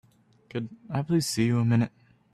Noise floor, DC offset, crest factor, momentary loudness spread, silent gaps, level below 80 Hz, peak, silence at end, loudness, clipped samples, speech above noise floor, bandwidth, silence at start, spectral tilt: -57 dBFS; under 0.1%; 14 dB; 12 LU; none; -62 dBFS; -12 dBFS; 0.45 s; -27 LUFS; under 0.1%; 31 dB; 14 kHz; 0.55 s; -6 dB/octave